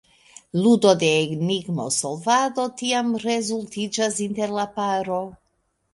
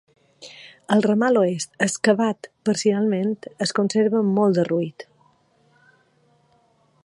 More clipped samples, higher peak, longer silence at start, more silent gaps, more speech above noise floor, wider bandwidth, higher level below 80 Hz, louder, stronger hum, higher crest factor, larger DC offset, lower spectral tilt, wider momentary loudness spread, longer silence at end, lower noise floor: neither; about the same, -4 dBFS vs -4 dBFS; first, 0.55 s vs 0.4 s; neither; first, 48 dB vs 41 dB; about the same, 11.5 kHz vs 11.5 kHz; first, -64 dBFS vs -70 dBFS; about the same, -22 LUFS vs -21 LUFS; neither; about the same, 20 dB vs 18 dB; neither; about the same, -4 dB/octave vs -5 dB/octave; about the same, 10 LU vs 10 LU; second, 0.6 s vs 2 s; first, -70 dBFS vs -61 dBFS